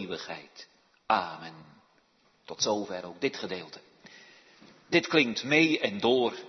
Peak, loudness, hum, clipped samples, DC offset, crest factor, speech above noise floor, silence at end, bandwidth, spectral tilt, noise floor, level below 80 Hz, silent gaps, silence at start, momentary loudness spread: -6 dBFS; -28 LUFS; none; under 0.1%; under 0.1%; 24 dB; 38 dB; 0 s; 6.4 kHz; -3.5 dB/octave; -67 dBFS; -76 dBFS; none; 0 s; 22 LU